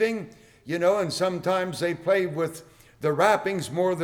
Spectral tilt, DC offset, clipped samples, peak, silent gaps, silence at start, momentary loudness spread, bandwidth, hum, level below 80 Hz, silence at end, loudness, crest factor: -5 dB/octave; under 0.1%; under 0.1%; -8 dBFS; none; 0 s; 11 LU; 19 kHz; none; -64 dBFS; 0 s; -25 LUFS; 18 dB